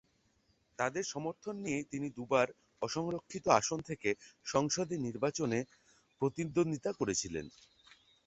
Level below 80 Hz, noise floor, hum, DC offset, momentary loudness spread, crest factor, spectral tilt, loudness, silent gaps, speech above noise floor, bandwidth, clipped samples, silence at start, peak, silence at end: -68 dBFS; -74 dBFS; none; under 0.1%; 10 LU; 24 dB; -4.5 dB/octave; -35 LUFS; none; 39 dB; 8.2 kHz; under 0.1%; 0.8 s; -12 dBFS; 0.8 s